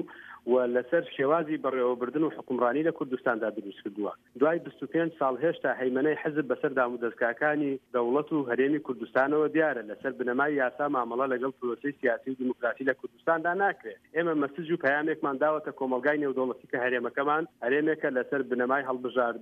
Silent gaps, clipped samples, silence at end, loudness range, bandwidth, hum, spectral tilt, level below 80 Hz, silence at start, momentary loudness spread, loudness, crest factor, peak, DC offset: none; under 0.1%; 0 s; 2 LU; 4.9 kHz; none; -8 dB/octave; -78 dBFS; 0 s; 6 LU; -29 LUFS; 16 dB; -12 dBFS; under 0.1%